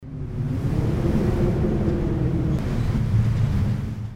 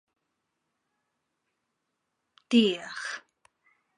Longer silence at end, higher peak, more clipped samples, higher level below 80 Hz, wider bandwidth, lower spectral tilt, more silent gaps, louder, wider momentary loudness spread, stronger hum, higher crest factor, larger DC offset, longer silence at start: second, 0 s vs 0.8 s; about the same, -8 dBFS vs -10 dBFS; neither; first, -30 dBFS vs -84 dBFS; about the same, 11.5 kHz vs 11 kHz; first, -9 dB/octave vs -4.5 dB/octave; neither; first, -23 LUFS vs -27 LUFS; second, 5 LU vs 14 LU; neither; second, 14 dB vs 24 dB; neither; second, 0 s vs 2.5 s